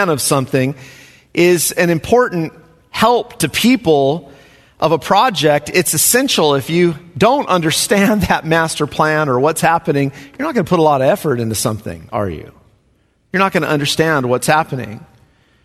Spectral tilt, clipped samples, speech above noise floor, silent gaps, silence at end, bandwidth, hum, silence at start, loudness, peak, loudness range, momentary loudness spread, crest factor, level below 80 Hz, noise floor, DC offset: -4 dB/octave; under 0.1%; 43 dB; none; 0.6 s; 14 kHz; none; 0 s; -14 LUFS; 0 dBFS; 4 LU; 10 LU; 16 dB; -46 dBFS; -57 dBFS; under 0.1%